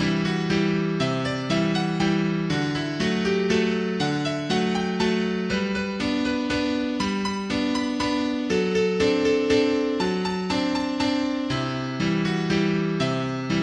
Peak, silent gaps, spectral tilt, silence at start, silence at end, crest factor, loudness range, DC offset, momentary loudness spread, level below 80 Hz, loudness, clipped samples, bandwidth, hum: -8 dBFS; none; -5.5 dB/octave; 0 s; 0 s; 14 dB; 2 LU; under 0.1%; 4 LU; -50 dBFS; -24 LUFS; under 0.1%; 10.5 kHz; none